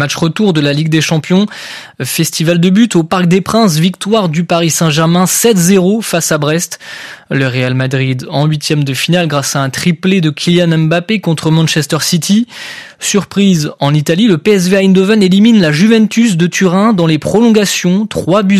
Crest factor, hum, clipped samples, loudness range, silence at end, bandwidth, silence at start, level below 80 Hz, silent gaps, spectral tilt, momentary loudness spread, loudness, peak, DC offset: 10 dB; none; under 0.1%; 4 LU; 0 s; 14.5 kHz; 0 s; -50 dBFS; none; -5 dB/octave; 6 LU; -10 LUFS; 0 dBFS; under 0.1%